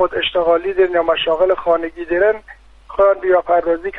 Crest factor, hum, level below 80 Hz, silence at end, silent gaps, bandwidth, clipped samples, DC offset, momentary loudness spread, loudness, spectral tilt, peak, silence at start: 12 dB; none; -44 dBFS; 0 s; none; 4.5 kHz; under 0.1%; under 0.1%; 4 LU; -16 LUFS; -6 dB/octave; -4 dBFS; 0 s